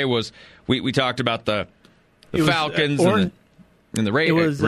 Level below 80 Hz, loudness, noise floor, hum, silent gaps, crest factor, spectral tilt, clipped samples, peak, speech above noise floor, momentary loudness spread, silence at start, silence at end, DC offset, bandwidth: -52 dBFS; -21 LUFS; -54 dBFS; none; none; 18 dB; -5.5 dB/octave; under 0.1%; -4 dBFS; 34 dB; 11 LU; 0 s; 0 s; under 0.1%; 14 kHz